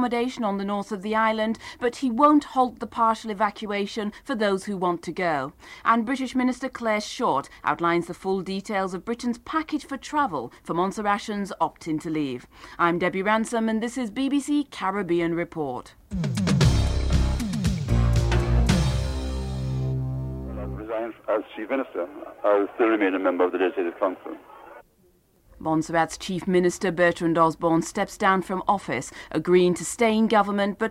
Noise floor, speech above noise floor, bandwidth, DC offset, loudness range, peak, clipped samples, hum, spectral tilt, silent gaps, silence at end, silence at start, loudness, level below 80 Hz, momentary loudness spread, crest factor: -61 dBFS; 37 dB; 15.5 kHz; under 0.1%; 4 LU; -6 dBFS; under 0.1%; none; -6 dB/octave; none; 0 s; 0 s; -25 LUFS; -36 dBFS; 10 LU; 18 dB